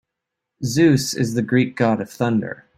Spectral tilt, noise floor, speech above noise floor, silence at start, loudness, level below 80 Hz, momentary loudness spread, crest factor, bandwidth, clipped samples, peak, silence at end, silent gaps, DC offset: -5.5 dB/octave; -82 dBFS; 63 dB; 0.6 s; -20 LUFS; -56 dBFS; 8 LU; 16 dB; 16 kHz; under 0.1%; -4 dBFS; 0.25 s; none; under 0.1%